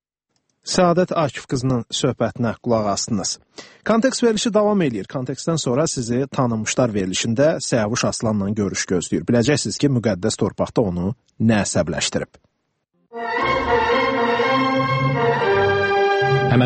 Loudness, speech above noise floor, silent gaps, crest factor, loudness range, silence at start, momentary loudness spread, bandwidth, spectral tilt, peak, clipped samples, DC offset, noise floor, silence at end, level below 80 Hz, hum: -20 LUFS; 51 dB; none; 16 dB; 3 LU; 0.65 s; 7 LU; 8.8 kHz; -5 dB/octave; -4 dBFS; under 0.1%; under 0.1%; -71 dBFS; 0 s; -48 dBFS; none